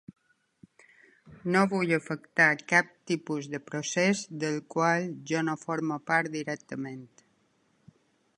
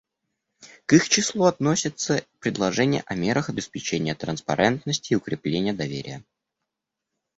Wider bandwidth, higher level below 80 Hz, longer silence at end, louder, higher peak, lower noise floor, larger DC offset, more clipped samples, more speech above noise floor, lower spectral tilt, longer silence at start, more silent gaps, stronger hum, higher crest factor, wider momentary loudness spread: first, 11.5 kHz vs 8.2 kHz; second, -74 dBFS vs -58 dBFS; first, 1.3 s vs 1.15 s; second, -28 LUFS vs -24 LUFS; second, -8 dBFS vs -4 dBFS; second, -70 dBFS vs -84 dBFS; neither; neither; second, 41 dB vs 61 dB; about the same, -5 dB/octave vs -4 dB/octave; first, 1.25 s vs 0.6 s; neither; neither; about the same, 22 dB vs 22 dB; first, 13 LU vs 10 LU